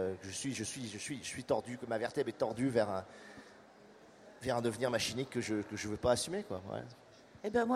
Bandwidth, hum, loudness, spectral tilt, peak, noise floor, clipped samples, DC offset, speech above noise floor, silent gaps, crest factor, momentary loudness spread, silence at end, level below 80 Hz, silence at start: 15 kHz; none; -37 LUFS; -4.5 dB/octave; -16 dBFS; -59 dBFS; under 0.1%; under 0.1%; 23 dB; none; 20 dB; 15 LU; 0 s; -66 dBFS; 0 s